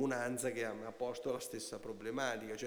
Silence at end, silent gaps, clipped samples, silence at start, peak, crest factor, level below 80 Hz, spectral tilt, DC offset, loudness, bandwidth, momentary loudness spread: 0 s; none; under 0.1%; 0 s; -24 dBFS; 16 dB; -74 dBFS; -4 dB/octave; under 0.1%; -41 LUFS; over 20 kHz; 7 LU